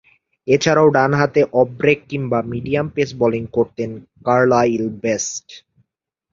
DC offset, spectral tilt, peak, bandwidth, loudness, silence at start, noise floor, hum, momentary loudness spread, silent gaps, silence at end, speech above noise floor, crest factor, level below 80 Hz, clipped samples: under 0.1%; -5.5 dB/octave; 0 dBFS; 7.6 kHz; -18 LUFS; 0.45 s; -81 dBFS; none; 11 LU; none; 0.75 s; 63 dB; 18 dB; -52 dBFS; under 0.1%